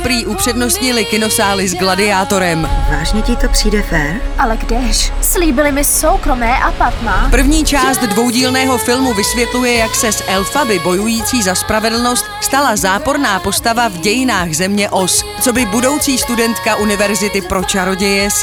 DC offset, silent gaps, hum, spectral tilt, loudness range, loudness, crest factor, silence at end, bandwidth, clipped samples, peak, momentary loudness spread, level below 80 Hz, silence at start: under 0.1%; none; none; -3 dB/octave; 2 LU; -13 LUFS; 12 dB; 0 s; over 20 kHz; under 0.1%; 0 dBFS; 4 LU; -20 dBFS; 0 s